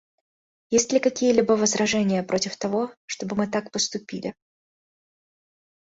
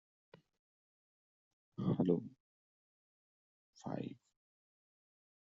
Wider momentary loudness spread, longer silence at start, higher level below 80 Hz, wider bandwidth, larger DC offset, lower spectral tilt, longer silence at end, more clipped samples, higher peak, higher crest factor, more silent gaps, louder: second, 12 LU vs 20 LU; second, 0.7 s vs 1.8 s; first, -64 dBFS vs -76 dBFS; about the same, 8 kHz vs 7.4 kHz; neither; second, -3.5 dB/octave vs -9.5 dB/octave; first, 1.65 s vs 1.3 s; neither; first, -6 dBFS vs -20 dBFS; about the same, 20 dB vs 24 dB; second, 2.97-3.08 s vs 2.40-3.73 s; first, -24 LUFS vs -39 LUFS